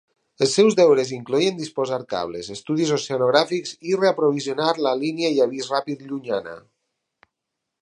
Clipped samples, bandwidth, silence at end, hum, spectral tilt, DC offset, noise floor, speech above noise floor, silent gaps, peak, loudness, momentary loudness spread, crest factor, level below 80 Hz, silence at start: under 0.1%; 11 kHz; 1.2 s; none; -4.5 dB/octave; under 0.1%; -82 dBFS; 61 dB; none; -2 dBFS; -21 LUFS; 11 LU; 20 dB; -68 dBFS; 0.4 s